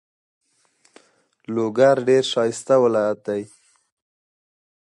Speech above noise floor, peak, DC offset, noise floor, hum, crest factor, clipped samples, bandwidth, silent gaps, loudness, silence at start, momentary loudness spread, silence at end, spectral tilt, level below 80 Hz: 44 dB; -4 dBFS; under 0.1%; -62 dBFS; none; 18 dB; under 0.1%; 11.5 kHz; none; -20 LUFS; 1.5 s; 12 LU; 1.4 s; -5 dB/octave; -70 dBFS